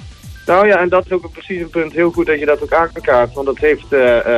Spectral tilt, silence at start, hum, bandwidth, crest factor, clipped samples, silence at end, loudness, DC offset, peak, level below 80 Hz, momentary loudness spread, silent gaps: -6.5 dB/octave; 0 s; none; 13 kHz; 12 dB; under 0.1%; 0 s; -14 LUFS; under 0.1%; -2 dBFS; -38 dBFS; 11 LU; none